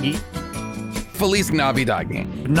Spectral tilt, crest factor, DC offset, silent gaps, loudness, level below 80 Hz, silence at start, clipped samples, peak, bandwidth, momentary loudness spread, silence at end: -5 dB/octave; 16 dB; under 0.1%; none; -22 LUFS; -38 dBFS; 0 s; under 0.1%; -6 dBFS; 17 kHz; 11 LU; 0 s